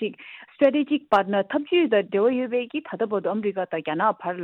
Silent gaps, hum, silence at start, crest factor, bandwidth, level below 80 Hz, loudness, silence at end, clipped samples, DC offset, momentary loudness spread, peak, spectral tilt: none; none; 0 s; 18 dB; 6.6 kHz; -72 dBFS; -23 LUFS; 0 s; under 0.1%; under 0.1%; 8 LU; -6 dBFS; -7.5 dB/octave